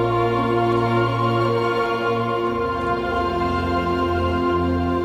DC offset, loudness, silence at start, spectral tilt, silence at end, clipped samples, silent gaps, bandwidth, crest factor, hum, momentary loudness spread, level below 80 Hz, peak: under 0.1%; -21 LUFS; 0 s; -7.5 dB/octave; 0 s; under 0.1%; none; 12.5 kHz; 12 dB; none; 3 LU; -40 dBFS; -8 dBFS